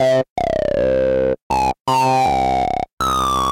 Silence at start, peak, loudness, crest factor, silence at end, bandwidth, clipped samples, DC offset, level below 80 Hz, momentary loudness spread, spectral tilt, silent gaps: 0 s; -6 dBFS; -18 LUFS; 10 dB; 0 s; 17 kHz; under 0.1%; under 0.1%; -36 dBFS; 4 LU; -5 dB/octave; 0.30-0.36 s, 1.42-1.50 s, 1.80-1.85 s, 2.93-2.97 s